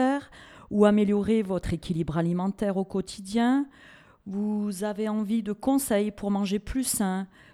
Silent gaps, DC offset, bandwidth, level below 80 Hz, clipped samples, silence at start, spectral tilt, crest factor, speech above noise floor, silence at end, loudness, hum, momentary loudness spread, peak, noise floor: none; under 0.1%; 15 kHz; -50 dBFS; under 0.1%; 0 s; -6 dB/octave; 20 dB; 22 dB; 0.3 s; -27 LUFS; none; 9 LU; -6 dBFS; -48 dBFS